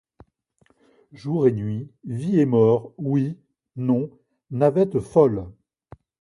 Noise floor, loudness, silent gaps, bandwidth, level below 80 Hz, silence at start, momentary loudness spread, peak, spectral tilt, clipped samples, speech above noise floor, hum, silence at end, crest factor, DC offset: -64 dBFS; -22 LUFS; none; 11 kHz; -56 dBFS; 1.15 s; 16 LU; -4 dBFS; -10 dB/octave; under 0.1%; 43 dB; none; 0.7 s; 20 dB; under 0.1%